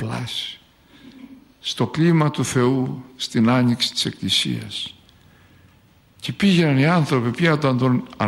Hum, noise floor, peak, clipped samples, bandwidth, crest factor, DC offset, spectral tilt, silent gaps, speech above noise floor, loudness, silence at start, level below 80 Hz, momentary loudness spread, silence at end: none; -54 dBFS; -6 dBFS; under 0.1%; 13 kHz; 16 dB; under 0.1%; -5.5 dB/octave; none; 35 dB; -20 LUFS; 0 s; -58 dBFS; 12 LU; 0 s